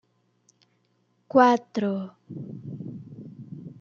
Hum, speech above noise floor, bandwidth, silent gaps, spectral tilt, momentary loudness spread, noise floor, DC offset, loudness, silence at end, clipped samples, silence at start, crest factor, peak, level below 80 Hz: 60 Hz at -50 dBFS; 46 dB; 7.2 kHz; none; -7 dB/octave; 23 LU; -69 dBFS; under 0.1%; -23 LUFS; 0.1 s; under 0.1%; 1.35 s; 24 dB; -4 dBFS; -74 dBFS